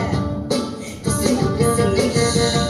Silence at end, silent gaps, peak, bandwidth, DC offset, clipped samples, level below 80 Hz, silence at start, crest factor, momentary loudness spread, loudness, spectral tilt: 0 s; none; -4 dBFS; 15 kHz; under 0.1%; under 0.1%; -34 dBFS; 0 s; 14 dB; 6 LU; -19 LUFS; -5 dB/octave